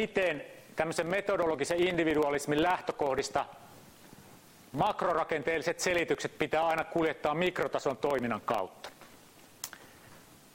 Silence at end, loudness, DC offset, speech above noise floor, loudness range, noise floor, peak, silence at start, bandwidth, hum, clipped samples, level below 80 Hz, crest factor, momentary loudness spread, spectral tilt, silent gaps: 0.35 s; -31 LUFS; under 0.1%; 26 dB; 3 LU; -56 dBFS; -14 dBFS; 0 s; 16 kHz; none; under 0.1%; -62 dBFS; 18 dB; 13 LU; -4.5 dB/octave; none